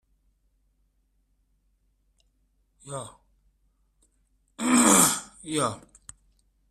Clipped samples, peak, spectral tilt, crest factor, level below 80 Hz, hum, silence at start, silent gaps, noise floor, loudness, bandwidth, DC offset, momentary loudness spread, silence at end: under 0.1%; -4 dBFS; -2.5 dB/octave; 24 dB; -62 dBFS; none; 2.85 s; none; -70 dBFS; -22 LUFS; 15.5 kHz; under 0.1%; 22 LU; 0.95 s